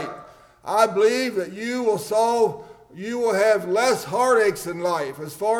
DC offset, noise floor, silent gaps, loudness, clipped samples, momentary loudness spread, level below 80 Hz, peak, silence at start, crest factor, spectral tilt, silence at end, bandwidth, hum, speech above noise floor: under 0.1%; -46 dBFS; none; -21 LUFS; under 0.1%; 13 LU; -62 dBFS; -6 dBFS; 0 s; 16 dB; -4 dB/octave; 0 s; 18.5 kHz; none; 25 dB